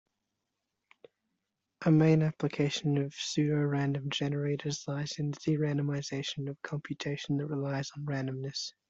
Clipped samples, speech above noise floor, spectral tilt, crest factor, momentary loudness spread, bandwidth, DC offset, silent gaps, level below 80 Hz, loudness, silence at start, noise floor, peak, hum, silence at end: under 0.1%; 54 dB; -6 dB/octave; 18 dB; 10 LU; 7.8 kHz; under 0.1%; none; -68 dBFS; -32 LUFS; 1.8 s; -85 dBFS; -14 dBFS; none; 0.2 s